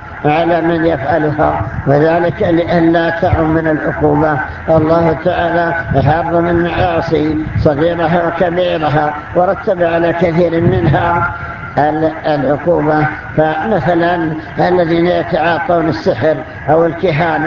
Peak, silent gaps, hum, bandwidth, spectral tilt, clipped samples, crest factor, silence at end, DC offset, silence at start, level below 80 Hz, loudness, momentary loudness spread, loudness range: 0 dBFS; none; none; 7 kHz; -8.5 dB/octave; under 0.1%; 12 dB; 0 s; under 0.1%; 0 s; -32 dBFS; -13 LUFS; 4 LU; 1 LU